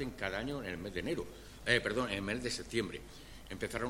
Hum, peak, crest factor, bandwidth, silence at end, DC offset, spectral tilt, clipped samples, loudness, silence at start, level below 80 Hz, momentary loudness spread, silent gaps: none; -14 dBFS; 24 dB; 16.5 kHz; 0 s; under 0.1%; -4 dB/octave; under 0.1%; -37 LUFS; 0 s; -54 dBFS; 17 LU; none